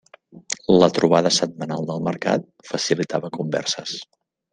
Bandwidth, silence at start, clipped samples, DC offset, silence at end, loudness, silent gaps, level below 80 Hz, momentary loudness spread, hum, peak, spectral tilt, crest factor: 10.5 kHz; 0.35 s; under 0.1%; under 0.1%; 0.5 s; -21 LUFS; none; -60 dBFS; 13 LU; none; -2 dBFS; -4.5 dB/octave; 20 dB